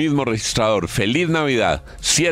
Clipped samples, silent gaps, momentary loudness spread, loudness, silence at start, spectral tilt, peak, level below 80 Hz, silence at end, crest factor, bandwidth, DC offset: under 0.1%; none; 3 LU; -19 LUFS; 0 s; -3.5 dB/octave; -4 dBFS; -40 dBFS; 0 s; 14 dB; 16 kHz; under 0.1%